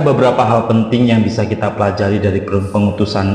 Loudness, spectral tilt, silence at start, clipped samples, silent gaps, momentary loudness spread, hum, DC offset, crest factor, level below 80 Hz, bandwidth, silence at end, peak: -14 LUFS; -7.5 dB/octave; 0 s; under 0.1%; none; 5 LU; none; under 0.1%; 14 dB; -44 dBFS; 10 kHz; 0 s; 0 dBFS